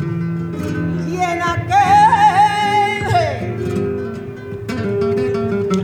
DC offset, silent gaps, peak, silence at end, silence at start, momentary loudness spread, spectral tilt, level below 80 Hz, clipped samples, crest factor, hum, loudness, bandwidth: under 0.1%; none; -2 dBFS; 0 s; 0 s; 13 LU; -6 dB/octave; -44 dBFS; under 0.1%; 14 dB; none; -16 LUFS; 15.5 kHz